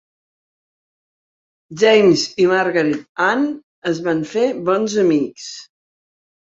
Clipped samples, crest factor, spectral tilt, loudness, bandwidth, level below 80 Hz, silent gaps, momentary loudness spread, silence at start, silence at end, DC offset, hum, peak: under 0.1%; 16 dB; -4.5 dB/octave; -17 LUFS; 7.8 kHz; -64 dBFS; 3.09-3.15 s, 3.63-3.82 s; 14 LU; 1.7 s; 0.85 s; under 0.1%; none; -2 dBFS